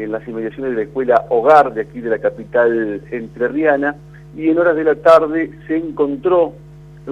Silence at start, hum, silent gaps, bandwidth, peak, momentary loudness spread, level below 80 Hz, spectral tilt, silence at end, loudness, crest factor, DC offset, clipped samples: 0 s; 50 Hz at -40 dBFS; none; 9.2 kHz; 0 dBFS; 13 LU; -48 dBFS; -7.5 dB/octave; 0 s; -16 LUFS; 16 dB; under 0.1%; under 0.1%